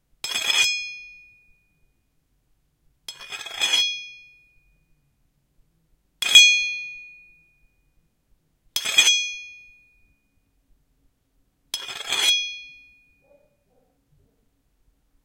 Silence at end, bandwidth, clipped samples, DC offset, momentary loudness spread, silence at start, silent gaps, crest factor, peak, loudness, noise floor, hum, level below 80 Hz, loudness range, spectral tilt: 2.55 s; 16.5 kHz; under 0.1%; under 0.1%; 26 LU; 0.25 s; none; 26 dB; 0 dBFS; -18 LUFS; -68 dBFS; none; -66 dBFS; 8 LU; 3.5 dB/octave